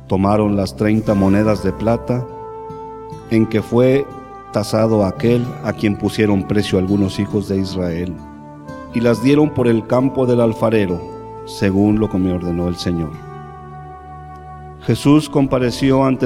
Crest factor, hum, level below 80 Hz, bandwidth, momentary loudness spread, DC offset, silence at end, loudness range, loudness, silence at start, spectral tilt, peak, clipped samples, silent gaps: 16 dB; none; -40 dBFS; 15.5 kHz; 20 LU; under 0.1%; 0 s; 4 LU; -17 LUFS; 0 s; -7.5 dB/octave; -2 dBFS; under 0.1%; none